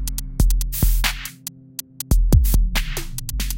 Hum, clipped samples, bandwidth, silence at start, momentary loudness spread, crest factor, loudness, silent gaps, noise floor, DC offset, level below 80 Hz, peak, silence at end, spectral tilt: none; under 0.1%; 17.5 kHz; 0 s; 14 LU; 16 dB; -22 LUFS; none; -38 dBFS; under 0.1%; -20 dBFS; -2 dBFS; 0 s; -4 dB/octave